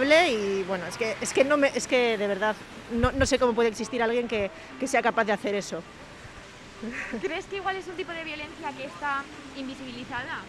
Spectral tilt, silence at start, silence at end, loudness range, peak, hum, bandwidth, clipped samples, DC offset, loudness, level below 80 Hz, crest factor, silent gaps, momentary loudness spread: -4 dB/octave; 0 s; 0 s; 9 LU; -8 dBFS; none; 14 kHz; under 0.1%; under 0.1%; -27 LUFS; -48 dBFS; 20 dB; none; 15 LU